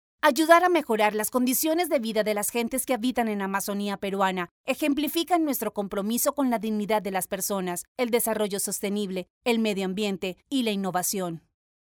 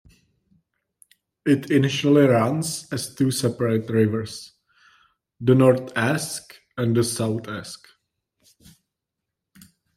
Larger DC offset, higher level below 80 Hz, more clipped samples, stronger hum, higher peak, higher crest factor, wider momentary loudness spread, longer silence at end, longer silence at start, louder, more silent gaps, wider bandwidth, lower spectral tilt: neither; about the same, -64 dBFS vs -62 dBFS; neither; neither; about the same, -4 dBFS vs -4 dBFS; about the same, 22 dB vs 20 dB; second, 7 LU vs 17 LU; second, 0.5 s vs 2.2 s; second, 0.25 s vs 1.45 s; second, -26 LUFS vs -21 LUFS; first, 4.51-4.64 s, 7.88-7.96 s, 9.30-9.41 s vs none; first, over 20 kHz vs 15.5 kHz; second, -3.5 dB/octave vs -5.5 dB/octave